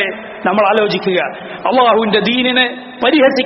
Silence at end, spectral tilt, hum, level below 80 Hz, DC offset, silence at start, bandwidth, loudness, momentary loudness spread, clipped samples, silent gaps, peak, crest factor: 0 s; -2 dB/octave; none; -56 dBFS; under 0.1%; 0 s; 6 kHz; -13 LUFS; 9 LU; under 0.1%; none; 0 dBFS; 14 dB